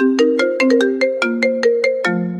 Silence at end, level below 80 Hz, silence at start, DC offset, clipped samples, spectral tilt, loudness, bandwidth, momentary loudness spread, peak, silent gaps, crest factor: 0 s; -68 dBFS; 0 s; under 0.1%; under 0.1%; -5.5 dB/octave; -16 LUFS; 11 kHz; 3 LU; -2 dBFS; none; 14 dB